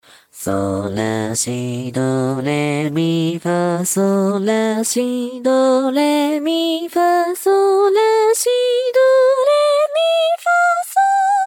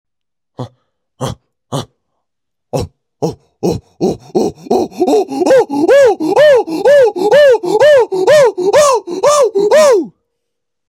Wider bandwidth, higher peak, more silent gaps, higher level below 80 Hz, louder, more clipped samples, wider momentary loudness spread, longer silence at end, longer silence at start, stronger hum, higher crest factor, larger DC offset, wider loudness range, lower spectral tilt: first, 18 kHz vs 16 kHz; second, -4 dBFS vs 0 dBFS; neither; second, -64 dBFS vs -46 dBFS; second, -16 LUFS vs -11 LUFS; neither; second, 7 LU vs 16 LU; second, 0 s vs 0.8 s; second, 0.35 s vs 0.6 s; neither; about the same, 10 dB vs 12 dB; neither; second, 5 LU vs 14 LU; about the same, -4.5 dB/octave vs -4.5 dB/octave